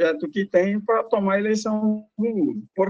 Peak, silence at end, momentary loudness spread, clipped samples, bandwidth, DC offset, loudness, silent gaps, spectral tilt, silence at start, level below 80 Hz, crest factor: -6 dBFS; 0 s; 5 LU; under 0.1%; 7.8 kHz; under 0.1%; -23 LUFS; none; -6.5 dB/octave; 0 s; -68 dBFS; 16 dB